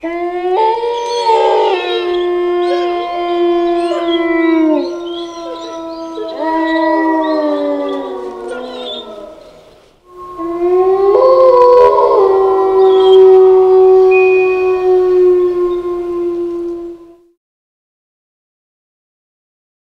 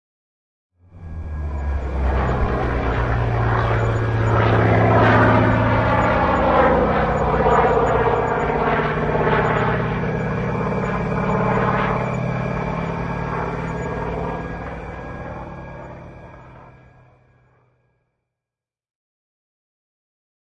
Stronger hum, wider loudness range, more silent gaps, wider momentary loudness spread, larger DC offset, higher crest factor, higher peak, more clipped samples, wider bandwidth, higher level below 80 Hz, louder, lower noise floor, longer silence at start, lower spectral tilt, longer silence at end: neither; about the same, 13 LU vs 14 LU; neither; about the same, 17 LU vs 16 LU; neither; about the same, 12 dB vs 16 dB; first, 0 dBFS vs -4 dBFS; neither; first, 8.6 kHz vs 7.4 kHz; second, -48 dBFS vs -30 dBFS; first, -11 LUFS vs -19 LUFS; second, -44 dBFS vs -89 dBFS; second, 0.05 s vs 0.95 s; second, -5 dB/octave vs -8 dB/octave; second, 2.9 s vs 3.75 s